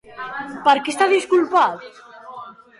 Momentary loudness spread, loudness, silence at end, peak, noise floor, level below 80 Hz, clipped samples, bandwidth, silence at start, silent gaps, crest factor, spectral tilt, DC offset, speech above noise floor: 21 LU; -18 LUFS; 0.3 s; -4 dBFS; -38 dBFS; -68 dBFS; under 0.1%; 11.5 kHz; 0.1 s; none; 16 dB; -3 dB/octave; under 0.1%; 21 dB